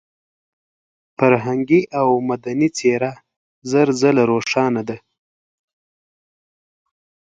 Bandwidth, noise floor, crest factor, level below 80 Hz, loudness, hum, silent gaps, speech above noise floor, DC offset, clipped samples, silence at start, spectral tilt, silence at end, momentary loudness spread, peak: 9.2 kHz; under -90 dBFS; 20 dB; -62 dBFS; -18 LUFS; none; 3.36-3.62 s; over 73 dB; under 0.1%; under 0.1%; 1.2 s; -6 dB/octave; 2.3 s; 10 LU; 0 dBFS